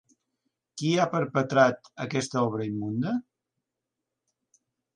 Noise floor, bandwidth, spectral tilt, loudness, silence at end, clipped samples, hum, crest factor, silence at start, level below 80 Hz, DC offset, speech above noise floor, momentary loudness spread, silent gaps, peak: -86 dBFS; 10.5 kHz; -5.5 dB/octave; -27 LUFS; 1.75 s; under 0.1%; none; 22 dB; 0.75 s; -70 dBFS; under 0.1%; 60 dB; 10 LU; none; -8 dBFS